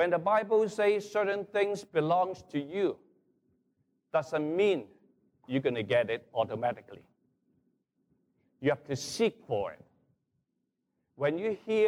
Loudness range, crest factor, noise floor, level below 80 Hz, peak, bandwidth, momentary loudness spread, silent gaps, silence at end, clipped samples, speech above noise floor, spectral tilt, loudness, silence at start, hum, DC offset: 5 LU; 16 dB; -82 dBFS; -74 dBFS; -16 dBFS; 13 kHz; 7 LU; none; 0 s; under 0.1%; 52 dB; -5.5 dB/octave; -31 LUFS; 0 s; none; under 0.1%